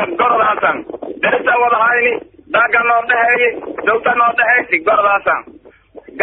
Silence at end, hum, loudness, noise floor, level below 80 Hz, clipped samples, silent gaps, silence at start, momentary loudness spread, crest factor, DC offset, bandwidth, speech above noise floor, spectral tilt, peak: 0 s; none; -13 LUFS; -40 dBFS; -54 dBFS; under 0.1%; none; 0 s; 7 LU; 14 dB; under 0.1%; 4.1 kHz; 27 dB; -0.5 dB/octave; 0 dBFS